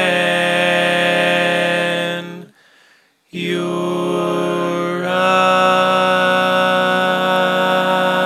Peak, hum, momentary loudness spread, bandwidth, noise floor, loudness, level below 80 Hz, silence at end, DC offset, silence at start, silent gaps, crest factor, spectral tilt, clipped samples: 0 dBFS; none; 8 LU; 15 kHz; -54 dBFS; -15 LUFS; -72 dBFS; 0 s; under 0.1%; 0 s; none; 16 dB; -4.5 dB/octave; under 0.1%